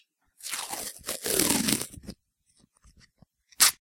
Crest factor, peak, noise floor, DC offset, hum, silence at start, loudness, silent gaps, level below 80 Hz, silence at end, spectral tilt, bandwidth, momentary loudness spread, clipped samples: 30 dB; 0 dBFS; -68 dBFS; under 0.1%; none; 0.4 s; -26 LUFS; none; -58 dBFS; 0.25 s; -1 dB/octave; 17 kHz; 19 LU; under 0.1%